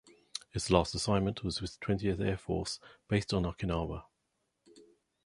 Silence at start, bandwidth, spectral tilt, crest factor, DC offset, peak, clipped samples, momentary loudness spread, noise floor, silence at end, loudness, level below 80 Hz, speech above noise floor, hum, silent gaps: 0.35 s; 11.5 kHz; -5.5 dB/octave; 26 dB; under 0.1%; -8 dBFS; under 0.1%; 12 LU; -81 dBFS; 0.45 s; -33 LUFS; -48 dBFS; 48 dB; none; none